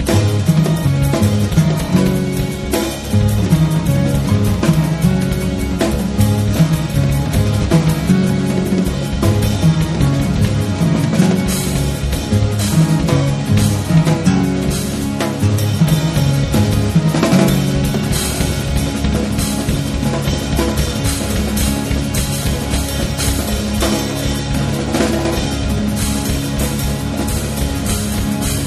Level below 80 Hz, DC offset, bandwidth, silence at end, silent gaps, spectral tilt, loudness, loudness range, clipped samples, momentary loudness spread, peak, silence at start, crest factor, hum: -24 dBFS; under 0.1%; 13.5 kHz; 0 s; none; -5.5 dB/octave; -16 LUFS; 3 LU; under 0.1%; 5 LU; 0 dBFS; 0 s; 14 dB; none